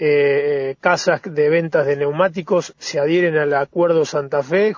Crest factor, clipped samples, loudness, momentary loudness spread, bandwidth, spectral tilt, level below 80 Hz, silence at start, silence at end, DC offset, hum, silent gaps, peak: 16 dB; under 0.1%; -18 LUFS; 5 LU; 7.4 kHz; -5.5 dB/octave; -64 dBFS; 0 s; 0 s; under 0.1%; none; none; -2 dBFS